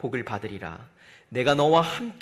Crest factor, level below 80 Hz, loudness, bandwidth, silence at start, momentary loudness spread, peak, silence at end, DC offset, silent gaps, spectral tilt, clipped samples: 18 dB; -60 dBFS; -24 LUFS; 15 kHz; 0 s; 18 LU; -8 dBFS; 0.05 s; under 0.1%; none; -5.5 dB/octave; under 0.1%